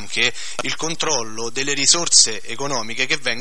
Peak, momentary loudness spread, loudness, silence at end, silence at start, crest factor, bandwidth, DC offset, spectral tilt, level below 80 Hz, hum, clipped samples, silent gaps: 0 dBFS; 13 LU; -18 LUFS; 0 s; 0 s; 22 dB; 12 kHz; 5%; -0.5 dB/octave; -58 dBFS; none; under 0.1%; none